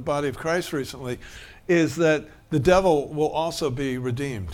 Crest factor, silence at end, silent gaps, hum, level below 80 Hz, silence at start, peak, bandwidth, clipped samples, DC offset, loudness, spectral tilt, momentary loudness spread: 18 dB; 0 s; none; none; -46 dBFS; 0 s; -6 dBFS; 17.5 kHz; under 0.1%; under 0.1%; -24 LUFS; -5.5 dB/octave; 14 LU